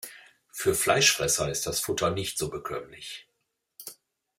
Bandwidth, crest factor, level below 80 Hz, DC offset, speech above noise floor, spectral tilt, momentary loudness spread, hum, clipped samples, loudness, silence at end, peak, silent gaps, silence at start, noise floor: 16 kHz; 22 dB; -56 dBFS; under 0.1%; 52 dB; -2 dB/octave; 23 LU; none; under 0.1%; -26 LUFS; 0.45 s; -8 dBFS; none; 0 s; -79 dBFS